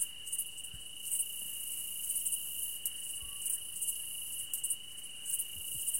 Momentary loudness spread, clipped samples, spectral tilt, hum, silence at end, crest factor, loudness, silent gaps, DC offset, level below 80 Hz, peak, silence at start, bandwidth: 6 LU; under 0.1%; 2 dB/octave; none; 0 s; 28 dB; -36 LUFS; none; 0.3%; -68 dBFS; -10 dBFS; 0 s; 16.5 kHz